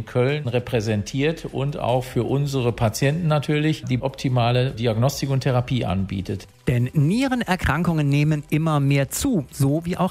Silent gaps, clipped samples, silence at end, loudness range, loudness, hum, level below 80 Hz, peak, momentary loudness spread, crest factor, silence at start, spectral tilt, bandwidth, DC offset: none; under 0.1%; 0 s; 2 LU; -22 LUFS; none; -44 dBFS; -6 dBFS; 5 LU; 14 dB; 0 s; -6.5 dB/octave; 16 kHz; under 0.1%